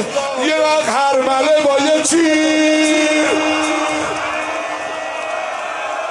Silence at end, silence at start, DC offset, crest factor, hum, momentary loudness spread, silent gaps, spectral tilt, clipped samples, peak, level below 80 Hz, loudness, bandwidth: 0 s; 0 s; under 0.1%; 12 dB; none; 9 LU; none; -2 dB/octave; under 0.1%; -4 dBFS; -58 dBFS; -15 LUFS; 11.5 kHz